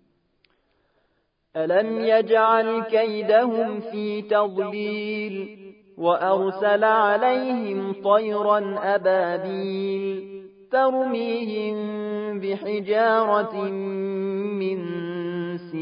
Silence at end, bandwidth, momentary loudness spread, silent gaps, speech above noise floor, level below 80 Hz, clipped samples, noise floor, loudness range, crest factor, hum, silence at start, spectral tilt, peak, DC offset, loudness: 0 s; 5.2 kHz; 10 LU; none; 47 dB; -78 dBFS; under 0.1%; -70 dBFS; 4 LU; 18 dB; none; 1.55 s; -10 dB/octave; -6 dBFS; under 0.1%; -23 LUFS